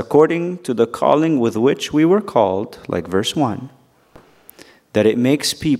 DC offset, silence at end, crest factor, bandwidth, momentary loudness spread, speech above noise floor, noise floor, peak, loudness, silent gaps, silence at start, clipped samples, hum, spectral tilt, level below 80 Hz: under 0.1%; 0 s; 18 dB; 16 kHz; 8 LU; 32 dB; -48 dBFS; 0 dBFS; -17 LUFS; none; 0 s; under 0.1%; none; -5.5 dB/octave; -54 dBFS